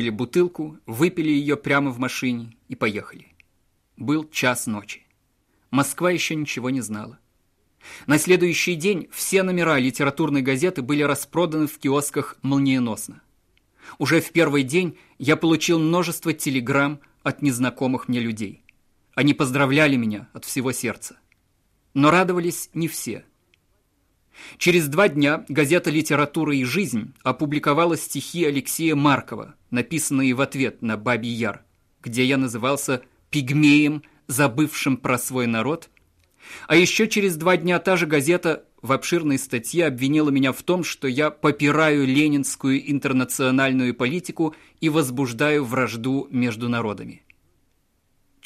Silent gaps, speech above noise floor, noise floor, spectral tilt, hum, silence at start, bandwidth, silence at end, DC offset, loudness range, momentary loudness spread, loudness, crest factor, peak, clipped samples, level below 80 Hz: none; 45 dB; -66 dBFS; -5 dB/octave; none; 0 s; 15.5 kHz; 1.3 s; under 0.1%; 4 LU; 11 LU; -21 LUFS; 18 dB; -4 dBFS; under 0.1%; -60 dBFS